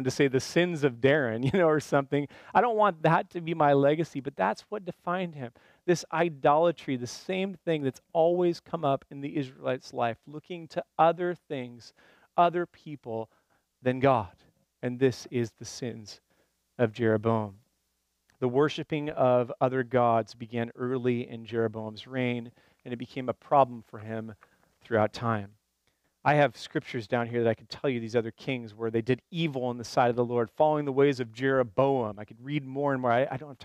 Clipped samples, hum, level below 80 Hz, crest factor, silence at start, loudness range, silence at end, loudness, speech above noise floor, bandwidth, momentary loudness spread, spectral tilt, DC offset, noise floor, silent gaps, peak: under 0.1%; none; -68 dBFS; 20 dB; 0 s; 5 LU; 0 s; -28 LUFS; 49 dB; 14.5 kHz; 13 LU; -6.5 dB/octave; under 0.1%; -77 dBFS; none; -8 dBFS